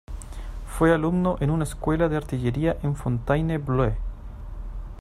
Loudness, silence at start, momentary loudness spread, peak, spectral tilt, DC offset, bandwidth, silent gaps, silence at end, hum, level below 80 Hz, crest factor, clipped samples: -24 LUFS; 0.1 s; 17 LU; -8 dBFS; -7.5 dB/octave; under 0.1%; 14.5 kHz; none; 0 s; none; -34 dBFS; 18 dB; under 0.1%